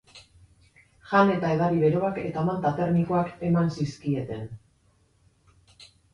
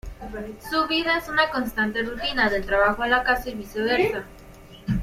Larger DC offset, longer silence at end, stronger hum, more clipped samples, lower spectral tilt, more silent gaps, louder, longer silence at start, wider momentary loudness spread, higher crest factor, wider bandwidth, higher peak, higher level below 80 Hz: neither; first, 0.3 s vs 0 s; neither; neither; first, -8 dB/octave vs -5 dB/octave; neither; about the same, -25 LUFS vs -23 LUFS; about the same, 0.15 s vs 0.05 s; second, 9 LU vs 15 LU; about the same, 20 dB vs 18 dB; second, 9.8 kHz vs 16.5 kHz; about the same, -6 dBFS vs -6 dBFS; second, -56 dBFS vs -42 dBFS